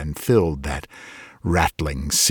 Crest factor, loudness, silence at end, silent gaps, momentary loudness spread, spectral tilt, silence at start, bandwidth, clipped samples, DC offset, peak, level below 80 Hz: 18 dB; -22 LUFS; 0 s; none; 20 LU; -3.5 dB/octave; 0 s; 19 kHz; under 0.1%; under 0.1%; -4 dBFS; -34 dBFS